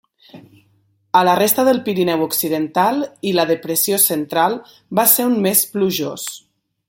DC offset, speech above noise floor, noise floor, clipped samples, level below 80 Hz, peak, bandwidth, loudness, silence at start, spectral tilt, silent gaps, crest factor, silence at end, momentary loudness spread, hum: under 0.1%; 43 dB; -60 dBFS; under 0.1%; -66 dBFS; 0 dBFS; 17 kHz; -16 LUFS; 0.35 s; -3.5 dB/octave; none; 18 dB; 0.5 s; 9 LU; none